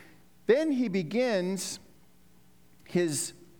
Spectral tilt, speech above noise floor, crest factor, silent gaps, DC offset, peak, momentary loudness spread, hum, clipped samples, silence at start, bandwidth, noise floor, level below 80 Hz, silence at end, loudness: -4.5 dB/octave; 34 dB; 20 dB; none; 0.1%; -10 dBFS; 11 LU; none; under 0.1%; 0.5 s; 20 kHz; -62 dBFS; -70 dBFS; 0.25 s; -29 LUFS